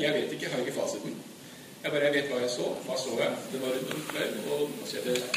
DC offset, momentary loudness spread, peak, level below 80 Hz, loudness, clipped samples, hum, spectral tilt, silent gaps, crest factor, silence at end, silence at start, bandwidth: under 0.1%; 10 LU; -12 dBFS; -76 dBFS; -31 LUFS; under 0.1%; none; -3.5 dB/octave; none; 20 dB; 0 s; 0 s; 15.5 kHz